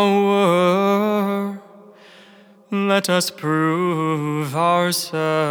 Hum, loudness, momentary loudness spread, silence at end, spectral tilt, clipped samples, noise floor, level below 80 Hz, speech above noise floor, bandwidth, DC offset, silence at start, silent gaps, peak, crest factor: none; -19 LUFS; 7 LU; 0 s; -5 dB/octave; under 0.1%; -48 dBFS; -84 dBFS; 29 dB; over 20 kHz; under 0.1%; 0 s; none; -4 dBFS; 16 dB